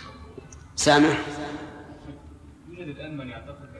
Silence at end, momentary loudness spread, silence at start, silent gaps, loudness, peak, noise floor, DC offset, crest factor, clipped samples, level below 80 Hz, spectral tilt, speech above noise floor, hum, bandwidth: 0 s; 26 LU; 0 s; none; -23 LUFS; -6 dBFS; -47 dBFS; under 0.1%; 22 dB; under 0.1%; -50 dBFS; -4 dB/octave; 23 dB; none; 11 kHz